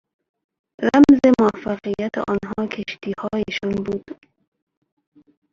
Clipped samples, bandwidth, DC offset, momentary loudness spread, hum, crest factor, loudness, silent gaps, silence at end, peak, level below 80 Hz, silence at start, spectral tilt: under 0.1%; 7.4 kHz; under 0.1%; 15 LU; none; 18 dB; -19 LUFS; none; 1.4 s; -2 dBFS; -52 dBFS; 0.8 s; -6.5 dB/octave